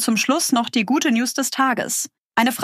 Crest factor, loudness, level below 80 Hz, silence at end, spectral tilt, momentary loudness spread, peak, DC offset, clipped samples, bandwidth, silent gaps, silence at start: 16 dB; -20 LUFS; -72 dBFS; 0 s; -2.5 dB/octave; 5 LU; -4 dBFS; under 0.1%; under 0.1%; 15.5 kHz; 2.20-2.30 s; 0 s